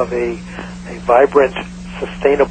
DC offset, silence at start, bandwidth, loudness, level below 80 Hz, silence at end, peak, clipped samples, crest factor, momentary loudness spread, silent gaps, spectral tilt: under 0.1%; 0 s; 9.2 kHz; -15 LUFS; -38 dBFS; 0 s; 0 dBFS; under 0.1%; 16 dB; 18 LU; none; -6 dB/octave